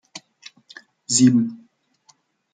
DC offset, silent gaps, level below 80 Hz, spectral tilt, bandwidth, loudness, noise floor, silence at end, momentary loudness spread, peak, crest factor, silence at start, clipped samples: under 0.1%; none; -66 dBFS; -4 dB/octave; 9.6 kHz; -18 LUFS; -60 dBFS; 0.95 s; 26 LU; -4 dBFS; 20 dB; 0.15 s; under 0.1%